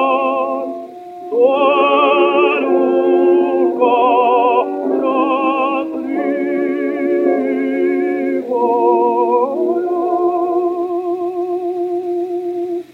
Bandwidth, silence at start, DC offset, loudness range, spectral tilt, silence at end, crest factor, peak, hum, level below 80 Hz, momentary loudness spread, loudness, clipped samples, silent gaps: 4.2 kHz; 0 s; under 0.1%; 4 LU; -6 dB/octave; 0.1 s; 12 dB; -2 dBFS; none; -74 dBFS; 8 LU; -15 LUFS; under 0.1%; none